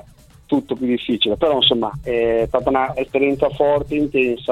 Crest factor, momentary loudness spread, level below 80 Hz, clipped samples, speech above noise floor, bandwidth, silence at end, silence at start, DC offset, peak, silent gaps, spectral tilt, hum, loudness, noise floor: 18 dB; 7 LU; -42 dBFS; under 0.1%; 28 dB; 12.5 kHz; 0 s; 0.5 s; under 0.1%; -2 dBFS; none; -6.5 dB/octave; none; -18 LUFS; -46 dBFS